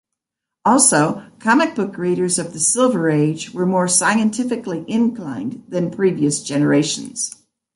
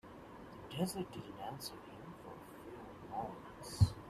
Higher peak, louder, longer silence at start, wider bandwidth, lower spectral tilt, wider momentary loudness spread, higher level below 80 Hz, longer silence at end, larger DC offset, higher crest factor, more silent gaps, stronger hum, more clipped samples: first, 0 dBFS vs -16 dBFS; first, -18 LUFS vs -44 LUFS; first, 0.65 s vs 0.05 s; second, 11.5 kHz vs 14.5 kHz; second, -4 dB/octave vs -6 dB/octave; second, 11 LU vs 14 LU; second, -62 dBFS vs -56 dBFS; first, 0.45 s vs 0 s; neither; second, 18 dB vs 26 dB; neither; neither; neither